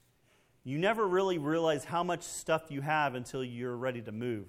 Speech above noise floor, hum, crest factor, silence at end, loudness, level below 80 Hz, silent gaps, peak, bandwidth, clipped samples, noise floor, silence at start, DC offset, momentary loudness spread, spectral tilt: 36 dB; none; 18 dB; 0 s; -33 LUFS; -68 dBFS; none; -14 dBFS; 15.5 kHz; under 0.1%; -68 dBFS; 0.65 s; under 0.1%; 9 LU; -5 dB/octave